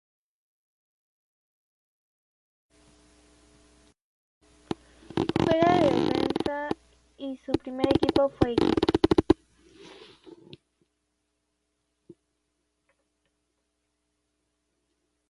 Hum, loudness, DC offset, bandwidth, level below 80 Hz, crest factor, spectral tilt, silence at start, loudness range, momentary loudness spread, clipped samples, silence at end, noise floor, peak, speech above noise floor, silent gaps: none; -25 LUFS; under 0.1%; 11.5 kHz; -50 dBFS; 26 dB; -7 dB/octave; 5.15 s; 10 LU; 16 LU; under 0.1%; 4.95 s; -78 dBFS; -4 dBFS; 54 dB; none